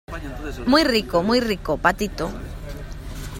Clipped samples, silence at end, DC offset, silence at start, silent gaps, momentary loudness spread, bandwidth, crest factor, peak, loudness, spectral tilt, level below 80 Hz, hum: under 0.1%; 0 s; under 0.1%; 0.1 s; none; 18 LU; 16.5 kHz; 20 dB; -2 dBFS; -21 LUFS; -5 dB/octave; -36 dBFS; none